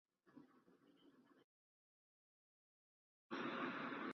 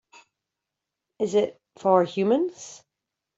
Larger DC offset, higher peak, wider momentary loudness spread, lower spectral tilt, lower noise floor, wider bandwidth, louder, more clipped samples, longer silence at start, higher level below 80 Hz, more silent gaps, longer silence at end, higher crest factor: neither; second, -34 dBFS vs -6 dBFS; first, 22 LU vs 13 LU; second, -2.5 dB/octave vs -6 dB/octave; second, -73 dBFS vs -86 dBFS; second, 6.6 kHz vs 8 kHz; second, -47 LUFS vs -24 LUFS; neither; second, 0.25 s vs 1.2 s; second, under -90 dBFS vs -74 dBFS; first, 1.44-3.30 s vs none; second, 0 s vs 0.6 s; about the same, 20 dB vs 20 dB